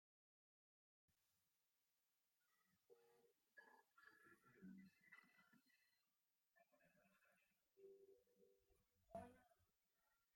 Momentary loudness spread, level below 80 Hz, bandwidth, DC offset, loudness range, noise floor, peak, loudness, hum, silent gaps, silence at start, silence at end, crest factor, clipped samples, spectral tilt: 8 LU; under -90 dBFS; 16 kHz; under 0.1%; 0 LU; under -90 dBFS; -46 dBFS; -65 LUFS; none; none; 1.1 s; 0 s; 28 dB; under 0.1%; -6 dB/octave